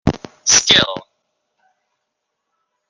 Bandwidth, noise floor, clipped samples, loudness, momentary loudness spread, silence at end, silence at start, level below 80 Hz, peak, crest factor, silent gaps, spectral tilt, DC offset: 11 kHz; -76 dBFS; under 0.1%; -13 LUFS; 14 LU; 1.9 s; 0.05 s; -42 dBFS; 0 dBFS; 20 dB; none; -1.5 dB/octave; under 0.1%